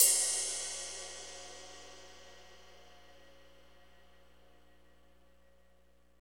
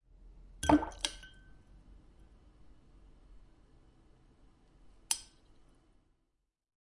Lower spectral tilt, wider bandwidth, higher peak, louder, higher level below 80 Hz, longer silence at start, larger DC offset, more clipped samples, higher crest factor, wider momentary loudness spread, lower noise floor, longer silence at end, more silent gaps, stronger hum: second, 1.5 dB/octave vs -3.5 dB/octave; first, over 20 kHz vs 11.5 kHz; first, -8 dBFS vs -12 dBFS; about the same, -33 LUFS vs -33 LUFS; second, -68 dBFS vs -56 dBFS; second, 0 s vs 0.65 s; first, 0.1% vs under 0.1%; neither; about the same, 32 dB vs 30 dB; first, 28 LU vs 25 LU; second, -69 dBFS vs -81 dBFS; first, 3.7 s vs 1.75 s; neither; first, 60 Hz at -70 dBFS vs none